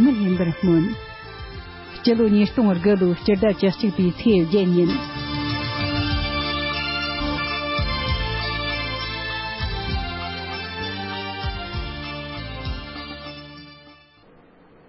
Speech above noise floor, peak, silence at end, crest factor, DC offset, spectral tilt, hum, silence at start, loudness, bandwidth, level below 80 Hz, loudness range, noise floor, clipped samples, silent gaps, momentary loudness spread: 33 dB; -6 dBFS; 0.95 s; 16 dB; under 0.1%; -10 dB/octave; none; 0 s; -22 LUFS; 5.8 kHz; -36 dBFS; 11 LU; -52 dBFS; under 0.1%; none; 15 LU